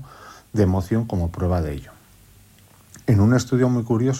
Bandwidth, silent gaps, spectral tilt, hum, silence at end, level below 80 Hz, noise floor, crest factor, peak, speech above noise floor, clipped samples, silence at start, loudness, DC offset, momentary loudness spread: 15.5 kHz; none; -7.5 dB/octave; none; 0 s; -44 dBFS; -51 dBFS; 14 dB; -6 dBFS; 32 dB; under 0.1%; 0 s; -21 LUFS; under 0.1%; 12 LU